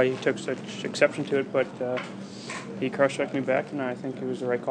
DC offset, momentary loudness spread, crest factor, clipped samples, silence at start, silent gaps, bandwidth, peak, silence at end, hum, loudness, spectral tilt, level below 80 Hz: under 0.1%; 10 LU; 22 dB; under 0.1%; 0 s; none; 10 kHz; -6 dBFS; 0 s; none; -28 LUFS; -5.5 dB/octave; -74 dBFS